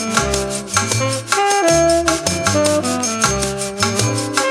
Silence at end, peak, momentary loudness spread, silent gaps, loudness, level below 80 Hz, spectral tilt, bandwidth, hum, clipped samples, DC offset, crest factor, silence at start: 0 s; 0 dBFS; 5 LU; none; -16 LUFS; -36 dBFS; -3 dB/octave; 17.5 kHz; none; under 0.1%; under 0.1%; 16 dB; 0 s